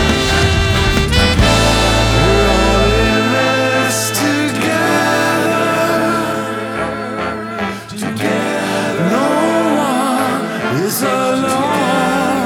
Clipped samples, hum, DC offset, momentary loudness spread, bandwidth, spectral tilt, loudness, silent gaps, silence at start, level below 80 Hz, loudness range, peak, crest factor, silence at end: under 0.1%; none; under 0.1%; 9 LU; 18.5 kHz; -4.5 dB/octave; -14 LUFS; none; 0 s; -24 dBFS; 5 LU; 0 dBFS; 14 dB; 0 s